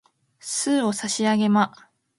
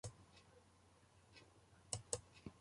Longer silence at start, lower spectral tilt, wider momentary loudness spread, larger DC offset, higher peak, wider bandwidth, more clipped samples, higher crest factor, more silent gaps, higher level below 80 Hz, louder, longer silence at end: first, 0.45 s vs 0.05 s; about the same, -4 dB/octave vs -3 dB/octave; second, 8 LU vs 23 LU; neither; first, -6 dBFS vs -24 dBFS; about the same, 11.5 kHz vs 11.5 kHz; neither; second, 18 dB vs 32 dB; neither; about the same, -70 dBFS vs -72 dBFS; first, -22 LUFS vs -49 LUFS; first, 0.5 s vs 0 s